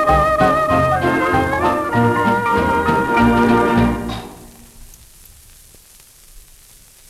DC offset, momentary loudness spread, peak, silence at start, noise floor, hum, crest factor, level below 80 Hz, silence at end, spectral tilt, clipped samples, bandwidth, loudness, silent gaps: under 0.1%; 5 LU; -2 dBFS; 0 s; -45 dBFS; none; 16 dB; -34 dBFS; 0.7 s; -6.5 dB/octave; under 0.1%; 15 kHz; -15 LUFS; none